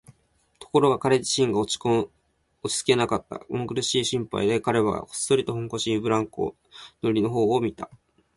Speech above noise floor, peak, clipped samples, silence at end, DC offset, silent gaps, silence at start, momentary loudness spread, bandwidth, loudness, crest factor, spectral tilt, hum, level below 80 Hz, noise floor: 42 dB; -6 dBFS; under 0.1%; 0.5 s; under 0.1%; none; 0.6 s; 10 LU; 11.5 kHz; -24 LUFS; 20 dB; -4.5 dB/octave; none; -56 dBFS; -66 dBFS